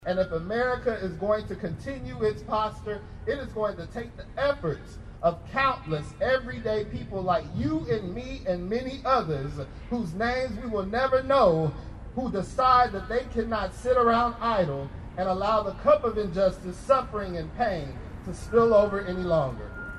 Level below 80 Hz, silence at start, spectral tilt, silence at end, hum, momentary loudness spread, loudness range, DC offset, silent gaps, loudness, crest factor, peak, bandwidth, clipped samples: -44 dBFS; 0 s; -6.5 dB/octave; 0 s; none; 14 LU; 6 LU; under 0.1%; none; -27 LUFS; 20 dB; -8 dBFS; 12 kHz; under 0.1%